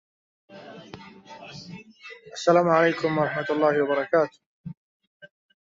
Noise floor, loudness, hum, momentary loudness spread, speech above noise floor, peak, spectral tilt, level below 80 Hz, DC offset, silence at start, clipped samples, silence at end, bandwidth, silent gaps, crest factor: -46 dBFS; -23 LUFS; none; 24 LU; 24 dB; -6 dBFS; -6 dB/octave; -68 dBFS; under 0.1%; 0.5 s; under 0.1%; 0.35 s; 7.8 kHz; 4.46-4.64 s, 4.77-5.00 s, 5.07-5.20 s; 20 dB